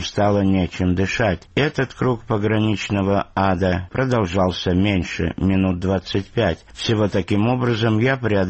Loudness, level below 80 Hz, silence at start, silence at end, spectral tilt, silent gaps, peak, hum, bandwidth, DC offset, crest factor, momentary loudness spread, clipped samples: -20 LUFS; -42 dBFS; 0 s; 0 s; -6.5 dB/octave; none; -6 dBFS; none; 8.4 kHz; 0.1%; 14 dB; 4 LU; under 0.1%